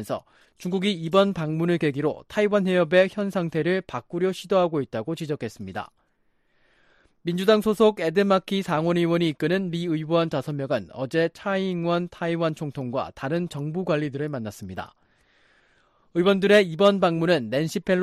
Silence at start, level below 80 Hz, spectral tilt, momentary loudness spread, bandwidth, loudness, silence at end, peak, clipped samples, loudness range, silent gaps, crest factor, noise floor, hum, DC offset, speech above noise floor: 0 s; -62 dBFS; -6.5 dB/octave; 12 LU; 14.5 kHz; -24 LUFS; 0 s; -6 dBFS; under 0.1%; 6 LU; none; 18 dB; -67 dBFS; none; under 0.1%; 44 dB